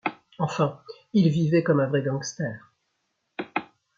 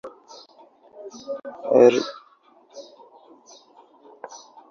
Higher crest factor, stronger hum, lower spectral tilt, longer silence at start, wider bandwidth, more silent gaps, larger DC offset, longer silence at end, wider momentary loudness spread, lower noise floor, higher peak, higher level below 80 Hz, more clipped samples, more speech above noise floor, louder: about the same, 18 dB vs 22 dB; neither; first, -6.5 dB/octave vs -5 dB/octave; about the same, 0.05 s vs 0.05 s; about the same, 7.6 kHz vs 7.2 kHz; neither; neither; about the same, 0.3 s vs 0.35 s; second, 16 LU vs 29 LU; first, -76 dBFS vs -56 dBFS; second, -8 dBFS vs -2 dBFS; about the same, -68 dBFS vs -72 dBFS; neither; first, 53 dB vs 37 dB; second, -25 LUFS vs -20 LUFS